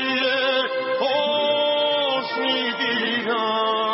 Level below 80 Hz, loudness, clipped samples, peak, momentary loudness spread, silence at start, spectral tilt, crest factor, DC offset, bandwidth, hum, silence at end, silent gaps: -80 dBFS; -21 LUFS; under 0.1%; -10 dBFS; 3 LU; 0 s; 0.5 dB/octave; 12 dB; under 0.1%; 5.8 kHz; none; 0 s; none